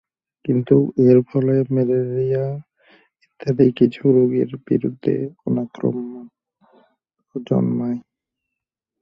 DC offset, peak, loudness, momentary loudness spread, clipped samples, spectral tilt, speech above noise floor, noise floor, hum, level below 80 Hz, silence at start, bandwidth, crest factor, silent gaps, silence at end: under 0.1%; -2 dBFS; -19 LUFS; 15 LU; under 0.1%; -10.5 dB/octave; 65 dB; -83 dBFS; none; -58 dBFS; 0.45 s; 6 kHz; 18 dB; none; 1 s